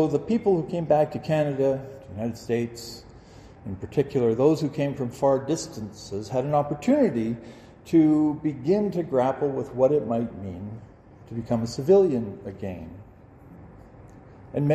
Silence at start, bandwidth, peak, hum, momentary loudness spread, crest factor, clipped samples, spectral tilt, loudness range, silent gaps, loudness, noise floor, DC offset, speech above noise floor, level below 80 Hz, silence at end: 0 s; 13.5 kHz; -8 dBFS; none; 17 LU; 18 dB; under 0.1%; -7.5 dB/octave; 3 LU; none; -25 LUFS; -49 dBFS; under 0.1%; 24 dB; -56 dBFS; 0 s